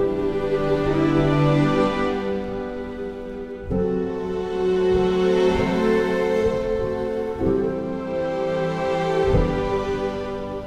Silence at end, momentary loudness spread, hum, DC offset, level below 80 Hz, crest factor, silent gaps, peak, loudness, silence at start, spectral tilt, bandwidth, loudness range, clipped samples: 0 s; 10 LU; none; under 0.1%; -36 dBFS; 16 dB; none; -6 dBFS; -22 LUFS; 0 s; -7.5 dB/octave; 10 kHz; 3 LU; under 0.1%